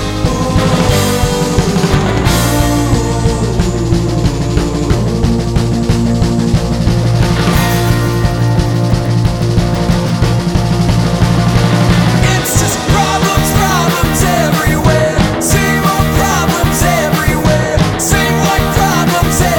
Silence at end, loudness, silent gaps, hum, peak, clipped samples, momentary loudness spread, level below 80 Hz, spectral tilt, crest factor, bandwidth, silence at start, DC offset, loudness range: 0 s; -12 LUFS; none; none; 0 dBFS; under 0.1%; 3 LU; -20 dBFS; -5 dB/octave; 10 dB; 19.5 kHz; 0 s; 0.2%; 2 LU